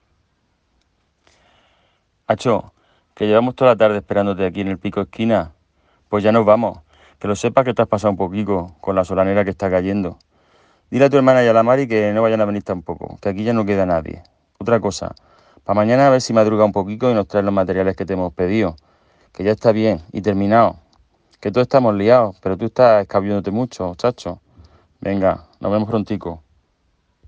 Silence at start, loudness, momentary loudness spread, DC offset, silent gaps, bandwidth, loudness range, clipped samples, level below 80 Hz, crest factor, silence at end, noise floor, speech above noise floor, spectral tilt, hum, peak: 2.3 s; -17 LUFS; 12 LU; under 0.1%; none; 9.4 kHz; 5 LU; under 0.1%; -52 dBFS; 18 dB; 0.9 s; -65 dBFS; 48 dB; -7 dB/octave; none; 0 dBFS